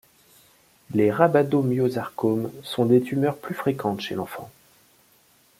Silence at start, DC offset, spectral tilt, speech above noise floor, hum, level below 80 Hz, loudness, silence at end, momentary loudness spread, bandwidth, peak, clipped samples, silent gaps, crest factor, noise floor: 0.9 s; under 0.1%; -7.5 dB/octave; 37 dB; none; -66 dBFS; -23 LUFS; 1.1 s; 11 LU; 16.5 kHz; -4 dBFS; under 0.1%; none; 22 dB; -59 dBFS